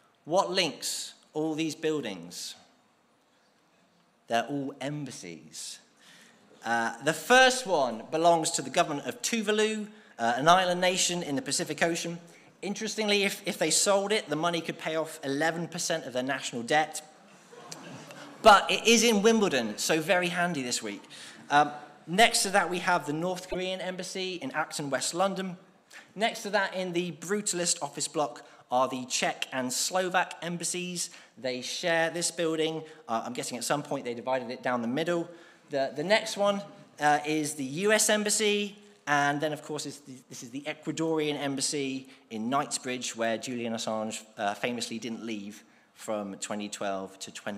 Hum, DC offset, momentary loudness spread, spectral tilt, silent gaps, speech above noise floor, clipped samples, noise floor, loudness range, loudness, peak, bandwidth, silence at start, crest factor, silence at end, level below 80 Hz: none; under 0.1%; 16 LU; -2.5 dB/octave; none; 38 dB; under 0.1%; -66 dBFS; 9 LU; -28 LUFS; -8 dBFS; 15.5 kHz; 0.25 s; 22 dB; 0 s; -66 dBFS